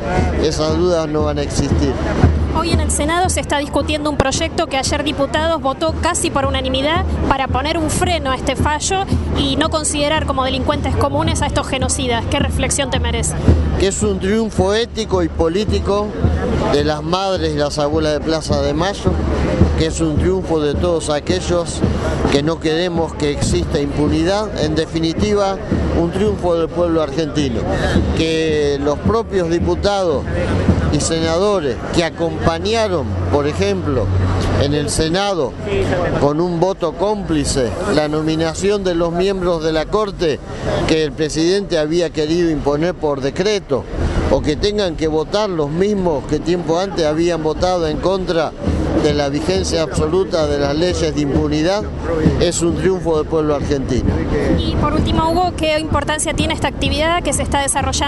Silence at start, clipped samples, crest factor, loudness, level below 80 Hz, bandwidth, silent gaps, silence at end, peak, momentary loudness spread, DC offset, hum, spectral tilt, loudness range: 0 s; under 0.1%; 16 dB; -17 LUFS; -26 dBFS; 11.5 kHz; none; 0 s; 0 dBFS; 3 LU; under 0.1%; none; -5 dB/octave; 1 LU